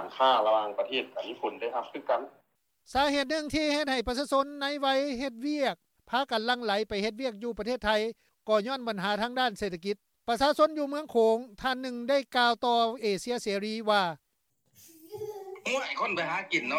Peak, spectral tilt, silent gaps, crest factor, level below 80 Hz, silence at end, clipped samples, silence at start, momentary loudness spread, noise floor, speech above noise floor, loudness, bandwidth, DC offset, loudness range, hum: -12 dBFS; -3.5 dB/octave; none; 18 dB; -58 dBFS; 0 s; under 0.1%; 0 s; 10 LU; -76 dBFS; 47 dB; -29 LUFS; 16.5 kHz; under 0.1%; 3 LU; none